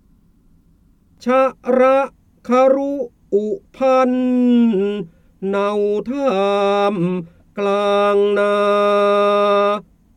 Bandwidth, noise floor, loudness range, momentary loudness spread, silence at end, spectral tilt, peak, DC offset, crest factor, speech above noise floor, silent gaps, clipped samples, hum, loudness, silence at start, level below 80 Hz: 9.4 kHz; -54 dBFS; 2 LU; 12 LU; 0.35 s; -6.5 dB/octave; -4 dBFS; under 0.1%; 14 dB; 38 dB; none; under 0.1%; none; -17 LUFS; 1.25 s; -56 dBFS